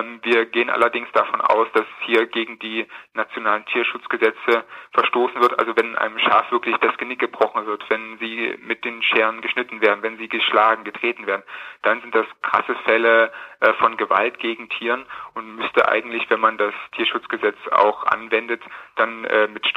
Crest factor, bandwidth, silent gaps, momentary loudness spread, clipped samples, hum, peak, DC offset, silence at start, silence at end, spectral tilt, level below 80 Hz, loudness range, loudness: 20 dB; 14 kHz; none; 9 LU; under 0.1%; none; -2 dBFS; under 0.1%; 0 s; 0 s; -4.5 dB/octave; -70 dBFS; 2 LU; -20 LUFS